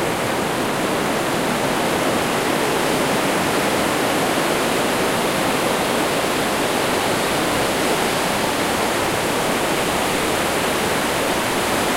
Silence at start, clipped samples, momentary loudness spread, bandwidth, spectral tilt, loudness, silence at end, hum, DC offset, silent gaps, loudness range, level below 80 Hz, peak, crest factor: 0 s; under 0.1%; 1 LU; 16 kHz; -3 dB/octave; -19 LUFS; 0 s; none; under 0.1%; none; 1 LU; -44 dBFS; -6 dBFS; 14 dB